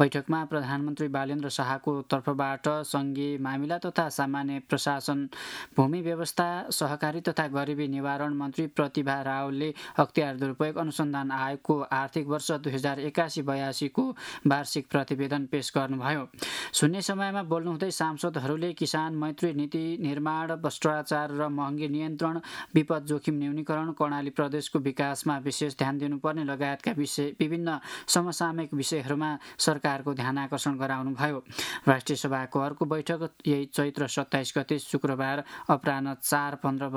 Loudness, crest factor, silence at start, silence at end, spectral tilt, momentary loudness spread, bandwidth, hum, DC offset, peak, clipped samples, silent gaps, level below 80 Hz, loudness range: -29 LUFS; 24 dB; 0 s; 0 s; -5 dB/octave; 5 LU; 16.5 kHz; none; under 0.1%; -4 dBFS; under 0.1%; none; -72 dBFS; 1 LU